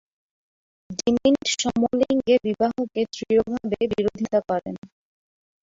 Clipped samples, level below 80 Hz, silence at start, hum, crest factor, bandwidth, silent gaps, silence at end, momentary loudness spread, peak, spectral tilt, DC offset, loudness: under 0.1%; -56 dBFS; 0.9 s; none; 18 dB; 7.8 kHz; 4.78-4.82 s; 0.8 s; 8 LU; -6 dBFS; -4.5 dB/octave; under 0.1%; -23 LUFS